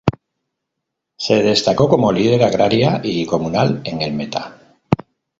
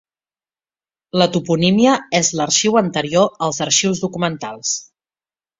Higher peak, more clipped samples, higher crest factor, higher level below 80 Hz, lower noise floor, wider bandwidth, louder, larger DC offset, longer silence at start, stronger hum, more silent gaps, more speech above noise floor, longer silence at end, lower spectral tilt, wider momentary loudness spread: about the same, 0 dBFS vs -2 dBFS; neither; about the same, 18 dB vs 18 dB; first, -46 dBFS vs -56 dBFS; second, -78 dBFS vs under -90 dBFS; about the same, 7.8 kHz vs 7.8 kHz; about the same, -17 LUFS vs -17 LUFS; neither; second, 0.05 s vs 1.15 s; neither; neither; second, 63 dB vs over 73 dB; second, 0.45 s vs 0.8 s; first, -6 dB/octave vs -3.5 dB/octave; about the same, 10 LU vs 8 LU